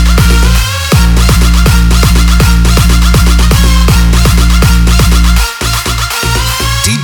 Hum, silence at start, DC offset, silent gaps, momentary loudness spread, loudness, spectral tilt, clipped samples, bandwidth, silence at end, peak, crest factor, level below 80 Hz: none; 0 s; under 0.1%; none; 4 LU; -8 LUFS; -4.5 dB/octave; 1%; 19.5 kHz; 0 s; 0 dBFS; 6 dB; -8 dBFS